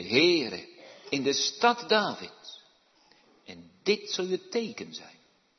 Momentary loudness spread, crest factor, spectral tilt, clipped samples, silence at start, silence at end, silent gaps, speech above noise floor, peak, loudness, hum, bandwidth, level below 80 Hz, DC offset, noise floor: 24 LU; 22 dB; -3 dB/octave; under 0.1%; 0 s; 0.5 s; none; 36 dB; -8 dBFS; -27 LUFS; none; 6.4 kHz; -78 dBFS; under 0.1%; -63 dBFS